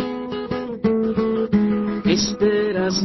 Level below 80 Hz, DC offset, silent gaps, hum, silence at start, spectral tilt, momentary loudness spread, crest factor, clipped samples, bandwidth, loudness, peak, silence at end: -46 dBFS; under 0.1%; none; none; 0 s; -5.5 dB/octave; 8 LU; 14 dB; under 0.1%; 6.2 kHz; -21 LUFS; -6 dBFS; 0 s